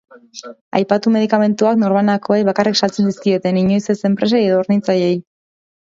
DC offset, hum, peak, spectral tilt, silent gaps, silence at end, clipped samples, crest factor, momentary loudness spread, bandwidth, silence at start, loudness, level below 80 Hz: under 0.1%; none; 0 dBFS; -6 dB/octave; 0.61-0.71 s; 0.75 s; under 0.1%; 16 dB; 7 LU; 7.6 kHz; 0.35 s; -16 LUFS; -60 dBFS